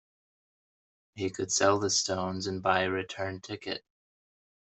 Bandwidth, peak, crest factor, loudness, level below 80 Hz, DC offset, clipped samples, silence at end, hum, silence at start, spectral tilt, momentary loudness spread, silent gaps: 8.4 kHz; -10 dBFS; 22 dB; -30 LUFS; -72 dBFS; under 0.1%; under 0.1%; 0.95 s; none; 1.15 s; -3 dB/octave; 12 LU; none